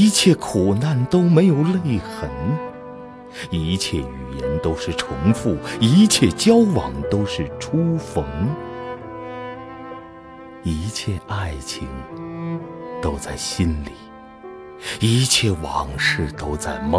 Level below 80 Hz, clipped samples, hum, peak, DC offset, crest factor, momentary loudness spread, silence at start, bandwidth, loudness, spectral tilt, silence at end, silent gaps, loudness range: -38 dBFS; under 0.1%; none; -2 dBFS; under 0.1%; 18 dB; 20 LU; 0 s; 11 kHz; -20 LUFS; -5 dB/octave; 0 s; none; 11 LU